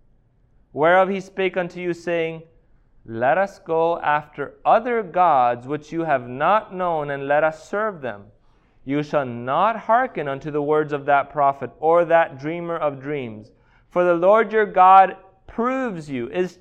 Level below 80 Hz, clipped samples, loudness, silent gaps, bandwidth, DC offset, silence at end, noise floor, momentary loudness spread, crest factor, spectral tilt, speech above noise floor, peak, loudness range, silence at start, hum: -56 dBFS; under 0.1%; -20 LUFS; none; 8.6 kHz; under 0.1%; 0.1 s; -58 dBFS; 12 LU; 20 dB; -7 dB/octave; 38 dB; -2 dBFS; 5 LU; 0.75 s; none